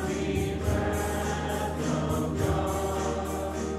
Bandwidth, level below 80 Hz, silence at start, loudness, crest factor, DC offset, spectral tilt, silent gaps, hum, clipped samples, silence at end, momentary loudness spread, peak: 15 kHz; -38 dBFS; 0 s; -29 LUFS; 14 dB; under 0.1%; -5.5 dB/octave; none; none; under 0.1%; 0 s; 3 LU; -14 dBFS